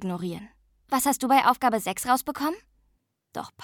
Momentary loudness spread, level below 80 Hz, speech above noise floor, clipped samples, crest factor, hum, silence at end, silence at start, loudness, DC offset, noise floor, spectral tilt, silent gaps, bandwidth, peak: 18 LU; -62 dBFS; 46 dB; under 0.1%; 20 dB; none; 0 s; 0 s; -25 LUFS; under 0.1%; -71 dBFS; -3.5 dB/octave; none; 19 kHz; -6 dBFS